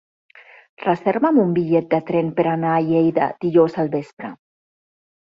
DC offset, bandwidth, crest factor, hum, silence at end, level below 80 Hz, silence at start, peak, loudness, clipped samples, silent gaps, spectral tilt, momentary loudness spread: under 0.1%; 5.6 kHz; 16 dB; none; 1 s; -62 dBFS; 0.35 s; -4 dBFS; -19 LUFS; under 0.1%; 0.69-0.77 s, 4.13-4.17 s; -9.5 dB/octave; 10 LU